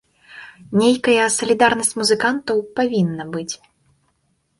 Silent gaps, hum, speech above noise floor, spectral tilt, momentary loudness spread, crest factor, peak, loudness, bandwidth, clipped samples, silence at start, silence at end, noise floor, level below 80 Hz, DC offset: none; none; 49 dB; -3.5 dB/octave; 17 LU; 18 dB; -2 dBFS; -18 LUFS; 11.5 kHz; under 0.1%; 0.3 s; 1.05 s; -66 dBFS; -58 dBFS; under 0.1%